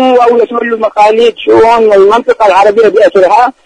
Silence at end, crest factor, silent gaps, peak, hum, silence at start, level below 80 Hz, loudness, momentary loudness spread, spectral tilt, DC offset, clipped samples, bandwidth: 0.15 s; 6 dB; none; 0 dBFS; none; 0 s; -44 dBFS; -6 LUFS; 4 LU; -4.5 dB/octave; under 0.1%; 4%; 10 kHz